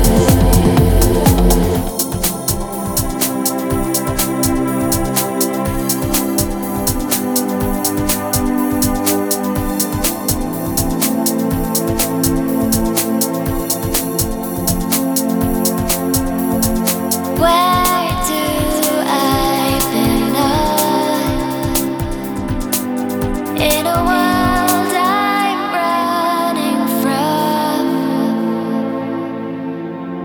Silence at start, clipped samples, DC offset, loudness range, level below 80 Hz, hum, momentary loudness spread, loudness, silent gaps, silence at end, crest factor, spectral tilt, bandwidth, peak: 0 s; under 0.1%; under 0.1%; 2 LU; -26 dBFS; none; 6 LU; -16 LUFS; none; 0 s; 16 dB; -4.5 dB/octave; over 20 kHz; 0 dBFS